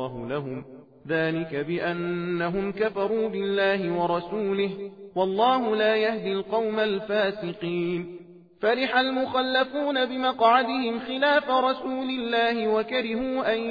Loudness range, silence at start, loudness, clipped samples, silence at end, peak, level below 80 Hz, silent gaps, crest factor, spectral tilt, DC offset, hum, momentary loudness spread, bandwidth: 3 LU; 0 s; -25 LUFS; under 0.1%; 0 s; -8 dBFS; -60 dBFS; none; 18 dB; -7.5 dB/octave; under 0.1%; none; 8 LU; 5 kHz